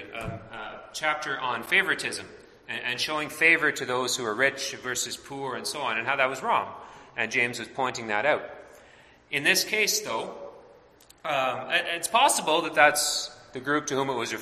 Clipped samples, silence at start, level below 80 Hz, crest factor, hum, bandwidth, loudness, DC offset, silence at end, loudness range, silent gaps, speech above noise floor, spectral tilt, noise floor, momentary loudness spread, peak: under 0.1%; 0 s; -62 dBFS; 24 dB; none; 16 kHz; -25 LUFS; under 0.1%; 0 s; 4 LU; none; 28 dB; -1.5 dB/octave; -55 dBFS; 16 LU; -4 dBFS